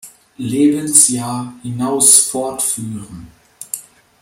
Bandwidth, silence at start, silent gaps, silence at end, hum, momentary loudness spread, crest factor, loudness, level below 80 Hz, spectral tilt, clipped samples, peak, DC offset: over 20 kHz; 0.05 s; none; 0.4 s; none; 19 LU; 16 dB; -12 LUFS; -54 dBFS; -3 dB/octave; 0.1%; 0 dBFS; under 0.1%